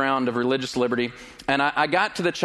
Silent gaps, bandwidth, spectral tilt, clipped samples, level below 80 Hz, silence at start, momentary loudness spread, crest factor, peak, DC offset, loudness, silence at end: none; 12.5 kHz; -4.5 dB/octave; under 0.1%; -58 dBFS; 0 s; 6 LU; 18 dB; -6 dBFS; under 0.1%; -23 LUFS; 0 s